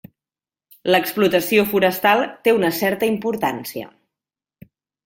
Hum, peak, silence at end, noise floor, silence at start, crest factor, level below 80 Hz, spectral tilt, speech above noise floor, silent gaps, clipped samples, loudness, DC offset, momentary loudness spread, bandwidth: none; 0 dBFS; 1.2 s; under -90 dBFS; 0.85 s; 20 dB; -60 dBFS; -4.5 dB/octave; over 72 dB; none; under 0.1%; -18 LUFS; under 0.1%; 13 LU; 17 kHz